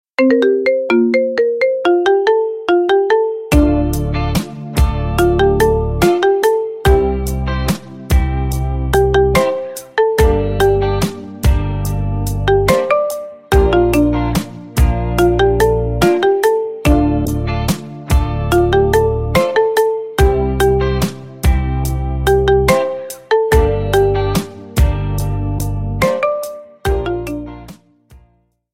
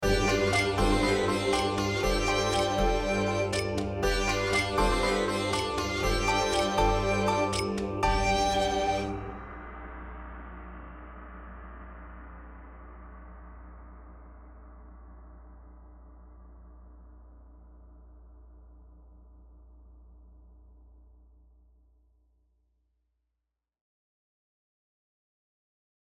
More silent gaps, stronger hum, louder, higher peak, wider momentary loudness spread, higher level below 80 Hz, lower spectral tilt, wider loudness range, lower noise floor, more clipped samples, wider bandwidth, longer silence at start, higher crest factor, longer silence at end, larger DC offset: neither; neither; first, -15 LUFS vs -27 LUFS; first, 0 dBFS vs -12 dBFS; second, 8 LU vs 23 LU; first, -22 dBFS vs -40 dBFS; first, -6.5 dB/octave vs -4.5 dB/octave; second, 2 LU vs 23 LU; second, -56 dBFS vs -86 dBFS; neither; about the same, 16.5 kHz vs 16 kHz; first, 0.2 s vs 0 s; about the same, 14 dB vs 18 dB; second, 0.55 s vs 6.05 s; neither